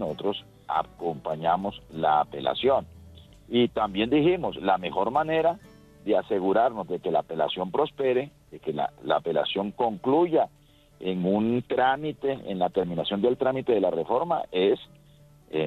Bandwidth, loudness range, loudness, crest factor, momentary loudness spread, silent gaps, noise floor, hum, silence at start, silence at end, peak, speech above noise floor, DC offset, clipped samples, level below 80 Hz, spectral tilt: 8.4 kHz; 2 LU; -26 LUFS; 18 dB; 8 LU; none; -55 dBFS; none; 0 s; 0 s; -8 dBFS; 29 dB; under 0.1%; under 0.1%; -58 dBFS; -7.5 dB/octave